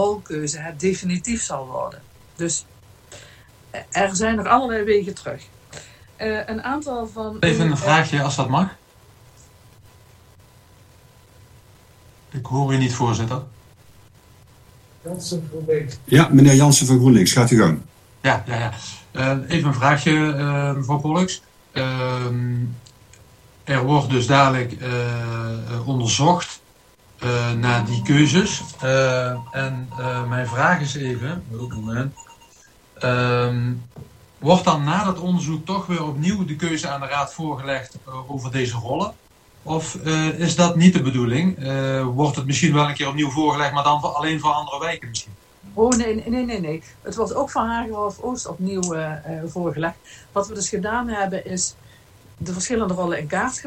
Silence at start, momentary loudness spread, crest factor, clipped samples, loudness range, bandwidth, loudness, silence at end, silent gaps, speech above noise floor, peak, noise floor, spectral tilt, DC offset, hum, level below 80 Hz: 0 s; 14 LU; 20 dB; under 0.1%; 9 LU; 13 kHz; -20 LUFS; 0 s; none; 33 dB; 0 dBFS; -53 dBFS; -5 dB/octave; under 0.1%; none; -48 dBFS